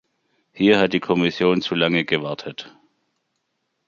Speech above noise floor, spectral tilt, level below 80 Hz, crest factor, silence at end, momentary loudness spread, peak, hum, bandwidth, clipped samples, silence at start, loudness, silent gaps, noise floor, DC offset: 55 dB; -6.5 dB/octave; -60 dBFS; 20 dB; 1.2 s; 14 LU; -2 dBFS; none; 7.4 kHz; under 0.1%; 0.55 s; -20 LUFS; none; -74 dBFS; under 0.1%